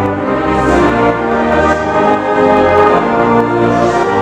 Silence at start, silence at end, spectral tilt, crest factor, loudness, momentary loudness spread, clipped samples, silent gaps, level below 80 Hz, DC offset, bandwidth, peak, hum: 0 s; 0 s; -6.5 dB/octave; 10 dB; -11 LUFS; 4 LU; 0.1%; none; -30 dBFS; under 0.1%; 11 kHz; 0 dBFS; none